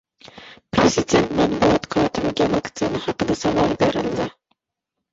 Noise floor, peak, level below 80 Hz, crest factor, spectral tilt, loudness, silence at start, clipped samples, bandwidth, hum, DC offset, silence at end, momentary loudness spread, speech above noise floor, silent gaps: -82 dBFS; -4 dBFS; -44 dBFS; 18 dB; -5 dB/octave; -20 LUFS; 0.25 s; under 0.1%; 8 kHz; none; under 0.1%; 0.8 s; 7 LU; 61 dB; none